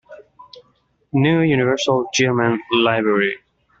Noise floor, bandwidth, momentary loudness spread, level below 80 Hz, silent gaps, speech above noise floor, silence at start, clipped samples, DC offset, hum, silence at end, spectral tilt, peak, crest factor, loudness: -62 dBFS; 8 kHz; 5 LU; -58 dBFS; none; 45 dB; 0.1 s; under 0.1%; under 0.1%; none; 0.45 s; -4.5 dB/octave; -4 dBFS; 16 dB; -18 LUFS